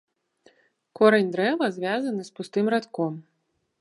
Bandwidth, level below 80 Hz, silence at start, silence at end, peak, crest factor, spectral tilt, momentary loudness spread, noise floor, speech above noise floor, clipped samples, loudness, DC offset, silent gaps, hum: 11.5 kHz; -78 dBFS; 1 s; 0.6 s; -4 dBFS; 22 dB; -6 dB/octave; 11 LU; -74 dBFS; 51 dB; under 0.1%; -24 LUFS; under 0.1%; none; none